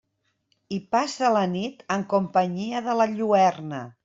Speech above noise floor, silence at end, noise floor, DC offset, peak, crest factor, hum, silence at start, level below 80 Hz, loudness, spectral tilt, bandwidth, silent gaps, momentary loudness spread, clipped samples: 48 dB; 0.15 s; -71 dBFS; under 0.1%; -8 dBFS; 16 dB; none; 0.7 s; -68 dBFS; -24 LUFS; -5.5 dB/octave; 7.8 kHz; none; 13 LU; under 0.1%